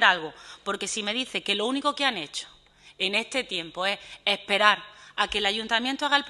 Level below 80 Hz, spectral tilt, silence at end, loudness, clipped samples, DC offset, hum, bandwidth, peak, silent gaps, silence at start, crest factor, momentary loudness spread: -60 dBFS; -1.5 dB/octave; 0 s; -26 LUFS; under 0.1%; under 0.1%; none; 12.5 kHz; -2 dBFS; none; 0 s; 24 dB; 13 LU